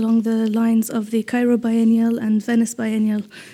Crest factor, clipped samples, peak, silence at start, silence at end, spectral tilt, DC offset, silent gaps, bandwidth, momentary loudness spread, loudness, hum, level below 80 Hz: 10 dB; under 0.1%; -8 dBFS; 0 s; 0 s; -6 dB/octave; under 0.1%; none; 15 kHz; 5 LU; -19 LUFS; none; -70 dBFS